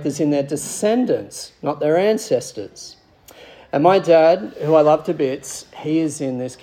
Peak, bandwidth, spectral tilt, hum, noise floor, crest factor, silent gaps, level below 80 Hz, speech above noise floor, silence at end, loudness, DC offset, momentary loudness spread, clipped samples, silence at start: -2 dBFS; 16 kHz; -5.5 dB/octave; none; -46 dBFS; 18 dB; none; -62 dBFS; 27 dB; 0.05 s; -18 LUFS; under 0.1%; 18 LU; under 0.1%; 0 s